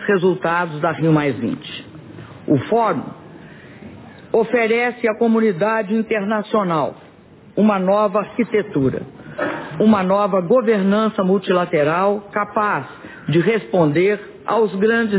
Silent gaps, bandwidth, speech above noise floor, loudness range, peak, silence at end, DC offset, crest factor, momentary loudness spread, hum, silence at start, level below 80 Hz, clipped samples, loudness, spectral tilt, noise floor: none; 4 kHz; 28 dB; 4 LU; -4 dBFS; 0 s; under 0.1%; 14 dB; 15 LU; none; 0 s; -56 dBFS; under 0.1%; -18 LUFS; -11 dB/octave; -45 dBFS